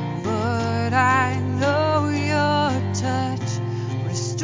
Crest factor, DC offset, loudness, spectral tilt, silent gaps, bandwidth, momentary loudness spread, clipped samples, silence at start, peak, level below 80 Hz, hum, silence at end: 16 dB; under 0.1%; -22 LUFS; -5.5 dB/octave; none; 7.6 kHz; 8 LU; under 0.1%; 0 s; -6 dBFS; -40 dBFS; none; 0 s